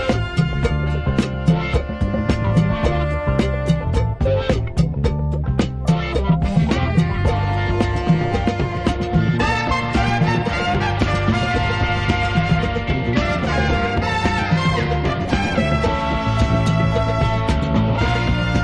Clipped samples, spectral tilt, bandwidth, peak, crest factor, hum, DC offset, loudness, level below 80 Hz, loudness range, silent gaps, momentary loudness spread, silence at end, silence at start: under 0.1%; -7 dB/octave; 10.5 kHz; -2 dBFS; 16 dB; none; under 0.1%; -19 LUFS; -26 dBFS; 1 LU; none; 3 LU; 0 s; 0 s